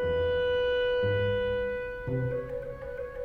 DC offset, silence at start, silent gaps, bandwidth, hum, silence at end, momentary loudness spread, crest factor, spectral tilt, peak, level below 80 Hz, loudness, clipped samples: under 0.1%; 0 s; none; 5.2 kHz; none; 0 s; 10 LU; 12 dB; -7.5 dB/octave; -18 dBFS; -46 dBFS; -30 LUFS; under 0.1%